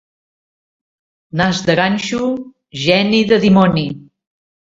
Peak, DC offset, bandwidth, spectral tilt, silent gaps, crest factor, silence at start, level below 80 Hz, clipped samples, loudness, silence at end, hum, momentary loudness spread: 0 dBFS; under 0.1%; 7.8 kHz; -5.5 dB/octave; none; 16 dB; 1.35 s; -48 dBFS; under 0.1%; -14 LUFS; 0.75 s; none; 14 LU